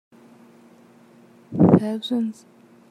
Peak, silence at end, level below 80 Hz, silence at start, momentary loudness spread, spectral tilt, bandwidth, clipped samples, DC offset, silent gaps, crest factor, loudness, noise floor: -2 dBFS; 0.6 s; -60 dBFS; 1.5 s; 14 LU; -8.5 dB/octave; 11 kHz; under 0.1%; under 0.1%; none; 22 dB; -20 LUFS; -51 dBFS